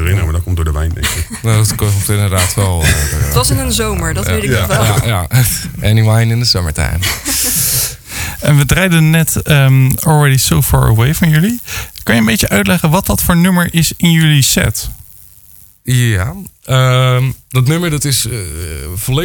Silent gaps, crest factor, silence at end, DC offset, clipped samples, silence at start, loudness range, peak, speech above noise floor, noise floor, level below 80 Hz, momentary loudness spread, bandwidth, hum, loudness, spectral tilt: none; 12 dB; 0 s; under 0.1%; under 0.1%; 0 s; 3 LU; 0 dBFS; 30 dB; -41 dBFS; -24 dBFS; 8 LU; 19.5 kHz; none; -12 LUFS; -4.5 dB/octave